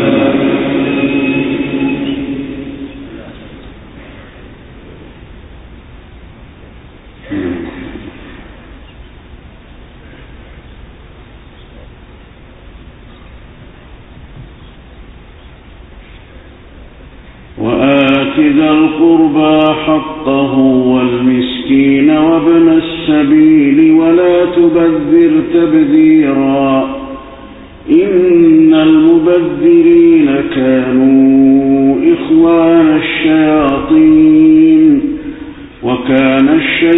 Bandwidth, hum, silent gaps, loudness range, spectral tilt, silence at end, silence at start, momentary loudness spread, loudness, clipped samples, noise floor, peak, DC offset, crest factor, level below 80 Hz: 4 kHz; none; none; 18 LU; -10 dB/octave; 0 s; 0 s; 16 LU; -9 LUFS; under 0.1%; -35 dBFS; 0 dBFS; under 0.1%; 10 dB; -38 dBFS